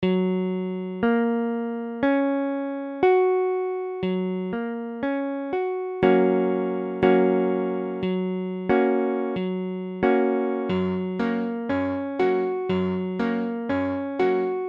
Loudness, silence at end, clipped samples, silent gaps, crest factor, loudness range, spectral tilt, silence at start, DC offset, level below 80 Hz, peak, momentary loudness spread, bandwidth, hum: -24 LUFS; 0 s; under 0.1%; none; 18 dB; 2 LU; -9.5 dB/octave; 0 s; under 0.1%; -60 dBFS; -6 dBFS; 8 LU; 5.4 kHz; none